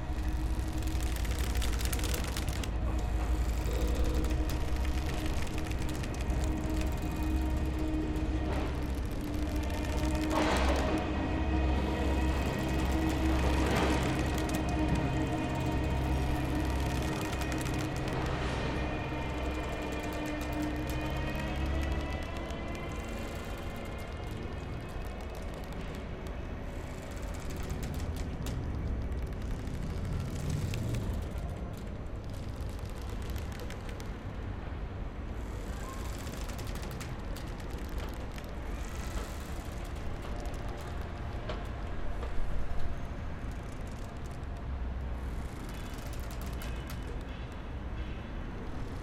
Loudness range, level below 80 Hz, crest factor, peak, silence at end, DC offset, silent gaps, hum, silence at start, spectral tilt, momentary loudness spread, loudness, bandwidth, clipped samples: 10 LU; -36 dBFS; 20 dB; -12 dBFS; 0 s; under 0.1%; none; none; 0 s; -6 dB/octave; 10 LU; -36 LUFS; 16.5 kHz; under 0.1%